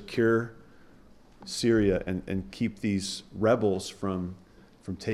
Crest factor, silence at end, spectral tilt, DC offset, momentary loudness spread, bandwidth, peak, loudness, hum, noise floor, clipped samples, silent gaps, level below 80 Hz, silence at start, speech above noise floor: 16 dB; 0 s; -5.5 dB/octave; under 0.1%; 15 LU; 14 kHz; -12 dBFS; -28 LUFS; none; -54 dBFS; under 0.1%; none; -52 dBFS; 0 s; 26 dB